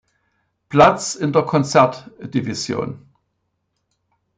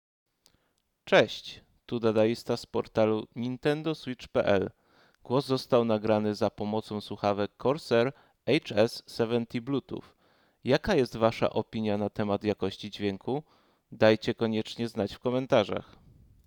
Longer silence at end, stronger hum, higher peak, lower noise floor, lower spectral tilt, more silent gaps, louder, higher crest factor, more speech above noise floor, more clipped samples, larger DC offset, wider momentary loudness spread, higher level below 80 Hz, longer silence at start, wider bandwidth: first, 1.4 s vs 0.65 s; neither; first, -2 dBFS vs -8 dBFS; about the same, -72 dBFS vs -75 dBFS; about the same, -5 dB/octave vs -6 dB/octave; neither; first, -18 LUFS vs -29 LUFS; about the same, 20 dB vs 22 dB; first, 55 dB vs 47 dB; neither; neither; first, 14 LU vs 10 LU; first, -54 dBFS vs -60 dBFS; second, 0.7 s vs 1.05 s; second, 9.6 kHz vs 19 kHz